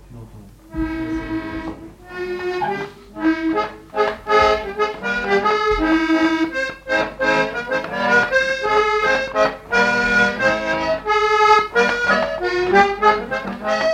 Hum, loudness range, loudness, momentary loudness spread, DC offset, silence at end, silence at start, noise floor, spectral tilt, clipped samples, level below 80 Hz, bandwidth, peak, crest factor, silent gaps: none; 7 LU; -18 LUFS; 11 LU; under 0.1%; 0 s; 0.1 s; -41 dBFS; -4.5 dB/octave; under 0.1%; -42 dBFS; 15 kHz; -2 dBFS; 18 dB; none